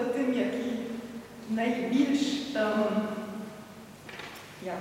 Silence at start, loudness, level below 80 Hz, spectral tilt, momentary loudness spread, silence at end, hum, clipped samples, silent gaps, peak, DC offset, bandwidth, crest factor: 0 s; -30 LUFS; -68 dBFS; -5 dB/octave; 16 LU; 0 s; 50 Hz at -65 dBFS; under 0.1%; none; -14 dBFS; under 0.1%; 16.5 kHz; 16 dB